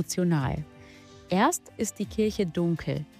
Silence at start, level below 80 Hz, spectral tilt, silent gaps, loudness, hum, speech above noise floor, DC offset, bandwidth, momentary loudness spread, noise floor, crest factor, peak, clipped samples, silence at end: 0 s; -52 dBFS; -5.5 dB/octave; none; -28 LUFS; none; 22 dB; under 0.1%; 15.5 kHz; 8 LU; -50 dBFS; 16 dB; -12 dBFS; under 0.1%; 0.15 s